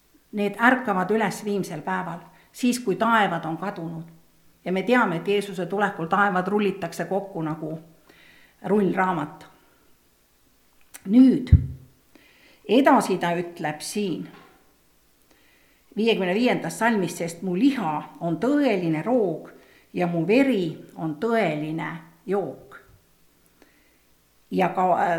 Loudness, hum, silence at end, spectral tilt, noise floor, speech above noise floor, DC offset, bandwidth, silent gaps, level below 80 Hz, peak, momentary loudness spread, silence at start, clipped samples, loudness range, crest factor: -23 LUFS; none; 0 s; -6 dB/octave; -61 dBFS; 39 dB; under 0.1%; 16 kHz; none; -42 dBFS; -2 dBFS; 15 LU; 0.35 s; under 0.1%; 7 LU; 22 dB